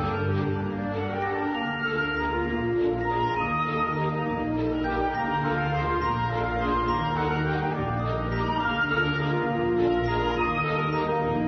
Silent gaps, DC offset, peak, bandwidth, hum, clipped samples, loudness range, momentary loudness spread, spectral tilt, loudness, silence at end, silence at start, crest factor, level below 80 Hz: none; under 0.1%; -14 dBFS; 6.4 kHz; none; under 0.1%; 1 LU; 3 LU; -8 dB/octave; -26 LUFS; 0 s; 0 s; 12 dB; -42 dBFS